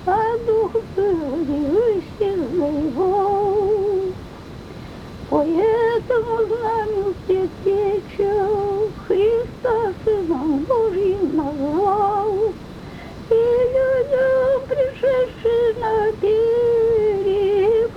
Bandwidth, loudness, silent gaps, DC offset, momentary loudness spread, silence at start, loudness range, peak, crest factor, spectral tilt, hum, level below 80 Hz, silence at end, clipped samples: 8.6 kHz; -19 LUFS; none; under 0.1%; 7 LU; 0 s; 3 LU; -4 dBFS; 14 dB; -7.5 dB/octave; none; -44 dBFS; 0 s; under 0.1%